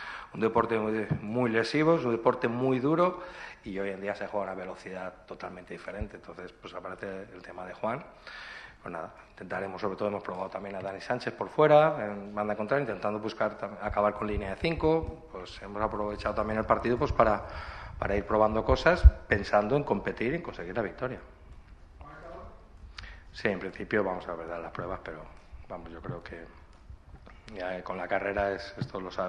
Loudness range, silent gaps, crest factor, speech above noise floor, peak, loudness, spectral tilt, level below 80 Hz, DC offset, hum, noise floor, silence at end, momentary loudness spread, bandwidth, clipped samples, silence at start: 13 LU; none; 26 dB; 21 dB; -4 dBFS; -30 LUFS; -7.5 dB/octave; -38 dBFS; under 0.1%; none; -51 dBFS; 0 s; 18 LU; 9.8 kHz; under 0.1%; 0 s